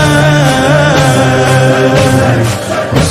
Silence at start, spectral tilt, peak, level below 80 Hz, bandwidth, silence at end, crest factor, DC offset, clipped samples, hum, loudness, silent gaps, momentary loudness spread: 0 s; -5.5 dB/octave; 0 dBFS; -30 dBFS; 15.5 kHz; 0 s; 8 dB; under 0.1%; 1%; none; -8 LUFS; none; 5 LU